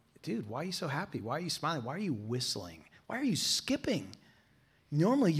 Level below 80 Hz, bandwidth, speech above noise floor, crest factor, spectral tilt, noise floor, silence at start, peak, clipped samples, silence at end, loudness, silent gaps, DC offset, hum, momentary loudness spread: -70 dBFS; 16 kHz; 34 dB; 16 dB; -4.5 dB/octave; -67 dBFS; 0.25 s; -18 dBFS; under 0.1%; 0 s; -34 LUFS; none; under 0.1%; none; 10 LU